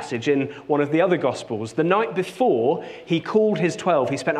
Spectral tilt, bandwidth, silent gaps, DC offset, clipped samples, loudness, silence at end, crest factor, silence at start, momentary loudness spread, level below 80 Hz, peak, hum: -6 dB/octave; 12 kHz; none; under 0.1%; under 0.1%; -22 LUFS; 0 s; 18 dB; 0 s; 6 LU; -66 dBFS; -4 dBFS; none